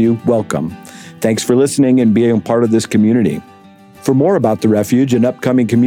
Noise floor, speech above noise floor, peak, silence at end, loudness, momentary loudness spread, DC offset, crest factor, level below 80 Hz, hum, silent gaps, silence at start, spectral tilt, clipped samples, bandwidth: -41 dBFS; 28 dB; 0 dBFS; 0 s; -13 LUFS; 9 LU; under 0.1%; 12 dB; -54 dBFS; none; none; 0 s; -6.5 dB/octave; under 0.1%; 16 kHz